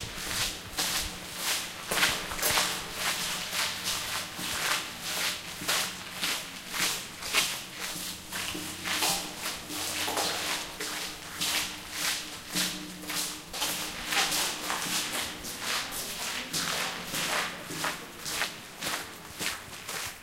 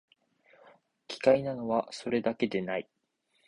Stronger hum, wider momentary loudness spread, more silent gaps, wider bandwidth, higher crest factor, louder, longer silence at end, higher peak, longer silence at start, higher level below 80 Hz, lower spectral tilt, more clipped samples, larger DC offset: neither; second, 8 LU vs 11 LU; neither; first, 16 kHz vs 10.5 kHz; about the same, 22 dB vs 22 dB; about the same, -30 LUFS vs -30 LUFS; second, 0 s vs 0.65 s; about the same, -10 dBFS vs -10 dBFS; second, 0 s vs 1.1 s; first, -56 dBFS vs -70 dBFS; second, -0.5 dB/octave vs -6 dB/octave; neither; neither